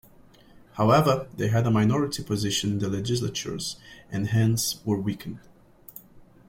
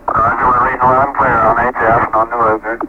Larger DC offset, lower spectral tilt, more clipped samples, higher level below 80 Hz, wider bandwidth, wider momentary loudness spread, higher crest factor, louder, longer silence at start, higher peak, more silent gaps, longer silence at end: neither; second, -5.5 dB/octave vs -8 dB/octave; neither; second, -54 dBFS vs -36 dBFS; first, 16.5 kHz vs 8.2 kHz; first, 21 LU vs 3 LU; first, 20 dB vs 12 dB; second, -25 LUFS vs -12 LUFS; first, 0.75 s vs 0.05 s; second, -6 dBFS vs 0 dBFS; neither; first, 0.3 s vs 0 s